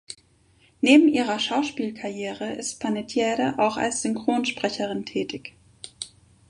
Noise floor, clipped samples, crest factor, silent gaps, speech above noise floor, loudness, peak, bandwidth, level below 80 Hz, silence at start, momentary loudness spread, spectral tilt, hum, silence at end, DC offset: -60 dBFS; under 0.1%; 22 dB; none; 36 dB; -24 LUFS; -4 dBFS; 11.5 kHz; -64 dBFS; 0.1 s; 20 LU; -3.5 dB/octave; none; 0.45 s; under 0.1%